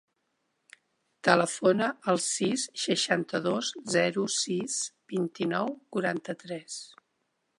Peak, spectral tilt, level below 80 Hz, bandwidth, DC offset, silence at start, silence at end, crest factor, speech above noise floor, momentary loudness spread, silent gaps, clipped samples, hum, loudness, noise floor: -6 dBFS; -3.5 dB/octave; -78 dBFS; 11.5 kHz; under 0.1%; 1.25 s; 0.7 s; 24 dB; 49 dB; 13 LU; none; under 0.1%; none; -28 LUFS; -78 dBFS